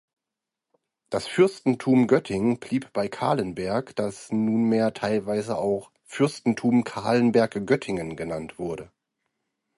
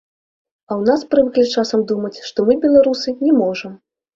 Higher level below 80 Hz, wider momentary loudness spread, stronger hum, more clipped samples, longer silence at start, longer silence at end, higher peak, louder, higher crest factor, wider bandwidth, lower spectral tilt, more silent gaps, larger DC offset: about the same, -60 dBFS vs -56 dBFS; about the same, 11 LU vs 11 LU; neither; neither; first, 1.1 s vs 0.7 s; first, 0.9 s vs 0.4 s; second, -6 dBFS vs -2 dBFS; second, -25 LUFS vs -16 LUFS; about the same, 20 dB vs 16 dB; first, 11.5 kHz vs 7.8 kHz; about the same, -6.5 dB/octave vs -5.5 dB/octave; neither; neither